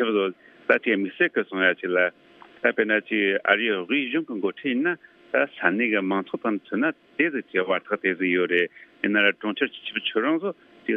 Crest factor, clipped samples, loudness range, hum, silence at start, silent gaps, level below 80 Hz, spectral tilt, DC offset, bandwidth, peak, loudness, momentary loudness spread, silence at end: 22 dB; under 0.1%; 2 LU; none; 0 s; none; -78 dBFS; -7.5 dB/octave; under 0.1%; 4.5 kHz; -2 dBFS; -24 LUFS; 7 LU; 0 s